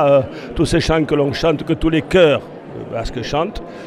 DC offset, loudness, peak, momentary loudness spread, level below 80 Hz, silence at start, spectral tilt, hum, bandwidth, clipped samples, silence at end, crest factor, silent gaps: under 0.1%; -17 LUFS; 0 dBFS; 13 LU; -32 dBFS; 0 s; -6 dB/octave; none; 12.5 kHz; under 0.1%; 0 s; 16 dB; none